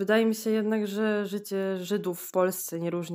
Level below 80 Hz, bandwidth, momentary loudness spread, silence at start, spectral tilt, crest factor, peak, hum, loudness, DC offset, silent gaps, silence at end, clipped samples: -82 dBFS; 16 kHz; 6 LU; 0 s; -5 dB/octave; 16 dB; -10 dBFS; none; -28 LUFS; under 0.1%; none; 0 s; under 0.1%